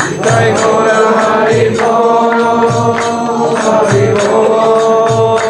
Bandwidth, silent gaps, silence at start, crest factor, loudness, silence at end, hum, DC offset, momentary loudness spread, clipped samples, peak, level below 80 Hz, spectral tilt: 11 kHz; none; 0 s; 10 dB; -10 LUFS; 0 s; none; under 0.1%; 3 LU; under 0.1%; 0 dBFS; -48 dBFS; -5 dB/octave